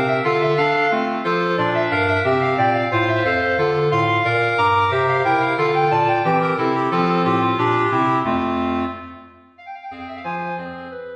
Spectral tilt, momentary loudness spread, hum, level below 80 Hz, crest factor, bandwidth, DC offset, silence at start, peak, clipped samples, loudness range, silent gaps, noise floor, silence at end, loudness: -7 dB/octave; 12 LU; none; -54 dBFS; 12 dB; 9.4 kHz; under 0.1%; 0 s; -6 dBFS; under 0.1%; 4 LU; none; -44 dBFS; 0 s; -18 LUFS